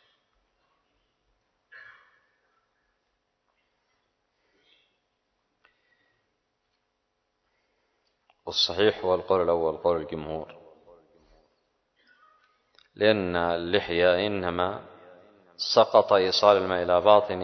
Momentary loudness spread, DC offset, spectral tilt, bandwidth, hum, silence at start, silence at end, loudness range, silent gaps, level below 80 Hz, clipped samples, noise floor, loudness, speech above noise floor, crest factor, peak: 14 LU; under 0.1%; -4.5 dB/octave; 6.4 kHz; none; 1.75 s; 0 s; 10 LU; none; -56 dBFS; under 0.1%; -77 dBFS; -24 LUFS; 54 dB; 24 dB; -4 dBFS